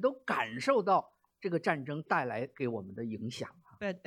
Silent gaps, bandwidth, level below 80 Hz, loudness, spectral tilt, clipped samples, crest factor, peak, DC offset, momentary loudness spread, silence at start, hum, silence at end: none; 15 kHz; -78 dBFS; -34 LUFS; -6 dB/octave; under 0.1%; 20 dB; -14 dBFS; under 0.1%; 11 LU; 0 s; none; 0.1 s